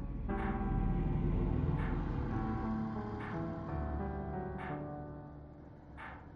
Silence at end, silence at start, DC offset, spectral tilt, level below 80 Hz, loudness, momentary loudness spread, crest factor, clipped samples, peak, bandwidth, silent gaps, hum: 0 s; 0 s; under 0.1%; -10 dB/octave; -42 dBFS; -38 LUFS; 15 LU; 16 dB; under 0.1%; -22 dBFS; 5.2 kHz; none; none